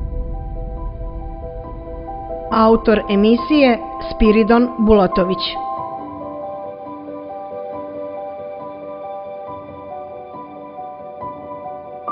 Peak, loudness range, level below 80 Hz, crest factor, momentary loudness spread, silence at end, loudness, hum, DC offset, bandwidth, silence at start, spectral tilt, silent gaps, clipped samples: 0 dBFS; 16 LU; -32 dBFS; 20 dB; 18 LU; 0 s; -18 LUFS; none; under 0.1%; 5.4 kHz; 0 s; -10.5 dB/octave; none; under 0.1%